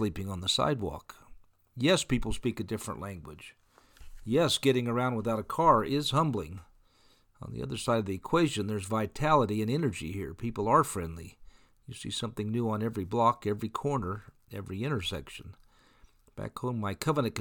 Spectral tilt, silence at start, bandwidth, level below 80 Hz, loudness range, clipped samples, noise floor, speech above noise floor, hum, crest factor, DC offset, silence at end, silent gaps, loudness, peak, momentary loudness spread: -5.5 dB/octave; 0 s; 19 kHz; -52 dBFS; 5 LU; under 0.1%; -64 dBFS; 34 dB; none; 22 dB; under 0.1%; 0 s; none; -30 LUFS; -10 dBFS; 19 LU